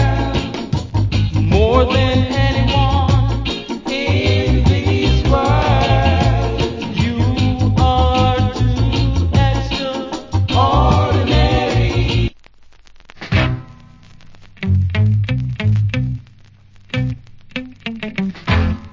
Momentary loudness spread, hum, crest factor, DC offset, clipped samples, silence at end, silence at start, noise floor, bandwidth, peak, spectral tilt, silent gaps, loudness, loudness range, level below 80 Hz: 10 LU; none; 16 dB; under 0.1%; under 0.1%; 0.05 s; 0 s; -44 dBFS; 7.6 kHz; 0 dBFS; -7 dB/octave; none; -16 LUFS; 5 LU; -22 dBFS